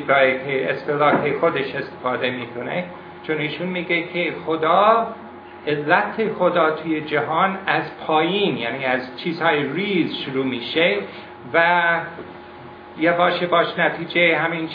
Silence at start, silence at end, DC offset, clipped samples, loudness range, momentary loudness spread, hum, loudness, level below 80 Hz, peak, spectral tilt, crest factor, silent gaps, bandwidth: 0 s; 0 s; under 0.1%; under 0.1%; 3 LU; 12 LU; none; -20 LUFS; -66 dBFS; 0 dBFS; -8 dB/octave; 20 dB; none; 5.2 kHz